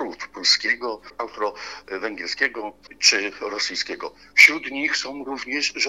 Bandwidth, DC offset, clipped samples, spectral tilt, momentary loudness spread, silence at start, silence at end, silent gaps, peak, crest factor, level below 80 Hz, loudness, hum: 16 kHz; 0.1%; under 0.1%; 0.5 dB/octave; 19 LU; 0 s; 0 s; none; 0 dBFS; 24 dB; -62 dBFS; -20 LUFS; none